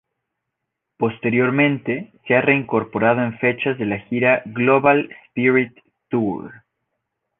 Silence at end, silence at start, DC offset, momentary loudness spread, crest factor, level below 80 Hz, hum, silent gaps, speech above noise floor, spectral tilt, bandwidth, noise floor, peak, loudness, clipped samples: 0.85 s; 1 s; under 0.1%; 9 LU; 18 dB; -60 dBFS; none; none; 61 dB; -10 dB/octave; 3.9 kHz; -80 dBFS; -2 dBFS; -19 LUFS; under 0.1%